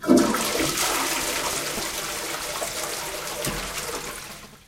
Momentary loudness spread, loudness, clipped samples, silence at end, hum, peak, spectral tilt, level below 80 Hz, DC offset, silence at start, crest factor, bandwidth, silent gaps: 8 LU; -25 LUFS; under 0.1%; 0.1 s; none; -4 dBFS; -2.5 dB/octave; -48 dBFS; under 0.1%; 0 s; 22 dB; 16.5 kHz; none